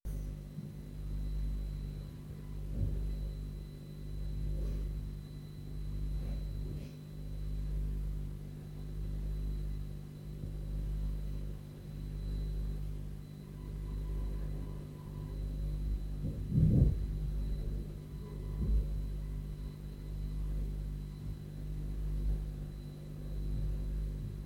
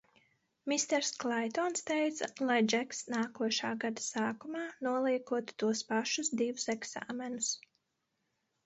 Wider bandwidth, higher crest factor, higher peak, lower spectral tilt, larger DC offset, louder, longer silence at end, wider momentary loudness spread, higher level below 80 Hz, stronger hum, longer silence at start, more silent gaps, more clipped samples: first, 13.5 kHz vs 8 kHz; about the same, 22 dB vs 18 dB; about the same, -16 dBFS vs -18 dBFS; first, -8.5 dB/octave vs -2.5 dB/octave; neither; second, -40 LUFS vs -34 LUFS; second, 0 s vs 1.1 s; about the same, 8 LU vs 7 LU; first, -38 dBFS vs -82 dBFS; first, 50 Hz at -40 dBFS vs none; second, 0.05 s vs 0.65 s; neither; neither